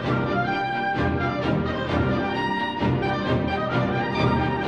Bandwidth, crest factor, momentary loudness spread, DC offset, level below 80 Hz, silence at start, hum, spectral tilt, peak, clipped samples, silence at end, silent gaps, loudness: 7.2 kHz; 14 dB; 2 LU; 0.1%; -40 dBFS; 0 s; none; -7.5 dB/octave; -10 dBFS; under 0.1%; 0 s; none; -24 LUFS